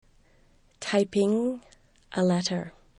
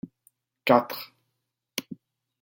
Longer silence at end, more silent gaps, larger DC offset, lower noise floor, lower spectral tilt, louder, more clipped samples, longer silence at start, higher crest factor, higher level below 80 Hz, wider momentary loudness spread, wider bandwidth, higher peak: second, 0.3 s vs 0.5 s; neither; neither; second, -60 dBFS vs -81 dBFS; about the same, -5.5 dB/octave vs -4.5 dB/octave; about the same, -27 LUFS vs -27 LUFS; neither; first, 0.8 s vs 0.65 s; second, 18 dB vs 24 dB; first, -62 dBFS vs -74 dBFS; second, 12 LU vs 24 LU; second, 11 kHz vs 17 kHz; second, -12 dBFS vs -6 dBFS